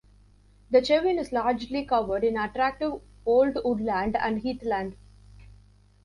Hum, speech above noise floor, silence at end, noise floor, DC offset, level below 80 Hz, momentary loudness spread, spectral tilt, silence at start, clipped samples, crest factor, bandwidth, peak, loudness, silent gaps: 50 Hz at -50 dBFS; 31 dB; 1.1 s; -56 dBFS; under 0.1%; -52 dBFS; 8 LU; -6 dB/octave; 0.7 s; under 0.1%; 18 dB; 11.5 kHz; -8 dBFS; -26 LUFS; none